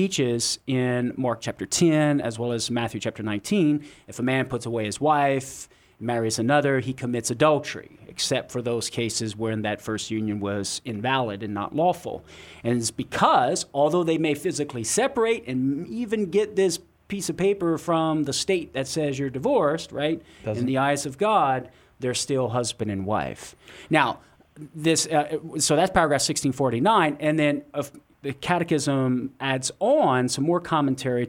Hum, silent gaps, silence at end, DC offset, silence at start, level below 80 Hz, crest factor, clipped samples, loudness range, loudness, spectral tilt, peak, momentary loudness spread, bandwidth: none; none; 0 s; under 0.1%; 0 s; -56 dBFS; 20 dB; under 0.1%; 4 LU; -24 LUFS; -4.5 dB/octave; -4 dBFS; 10 LU; 17 kHz